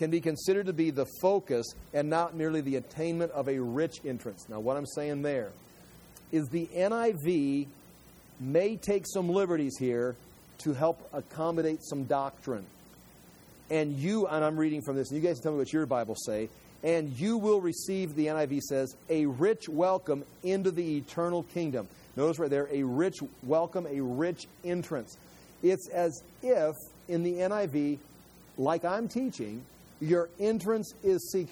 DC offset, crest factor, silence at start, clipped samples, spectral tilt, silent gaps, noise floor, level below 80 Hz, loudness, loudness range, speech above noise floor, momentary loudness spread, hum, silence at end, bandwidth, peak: under 0.1%; 18 dB; 0 s; under 0.1%; -6 dB/octave; none; -55 dBFS; -64 dBFS; -31 LUFS; 3 LU; 25 dB; 9 LU; none; 0 s; over 20 kHz; -12 dBFS